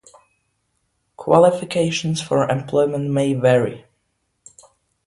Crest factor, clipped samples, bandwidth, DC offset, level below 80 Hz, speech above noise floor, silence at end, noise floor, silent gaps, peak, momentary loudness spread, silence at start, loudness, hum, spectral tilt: 20 dB; under 0.1%; 11.5 kHz; under 0.1%; -58 dBFS; 53 dB; 1.25 s; -71 dBFS; none; 0 dBFS; 7 LU; 1.2 s; -18 LUFS; none; -6 dB/octave